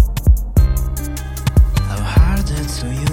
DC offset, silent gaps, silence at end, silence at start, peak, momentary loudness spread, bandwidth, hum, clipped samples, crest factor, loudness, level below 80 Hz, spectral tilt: under 0.1%; none; 0 s; 0 s; 0 dBFS; 8 LU; 17 kHz; none; under 0.1%; 14 dB; -17 LUFS; -16 dBFS; -6 dB/octave